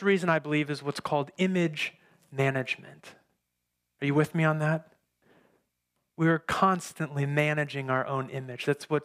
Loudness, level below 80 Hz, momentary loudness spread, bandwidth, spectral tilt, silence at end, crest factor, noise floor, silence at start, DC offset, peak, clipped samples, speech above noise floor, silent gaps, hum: -28 LUFS; -68 dBFS; 8 LU; 15.5 kHz; -6.5 dB/octave; 0 s; 20 dB; -82 dBFS; 0 s; under 0.1%; -10 dBFS; under 0.1%; 54 dB; none; none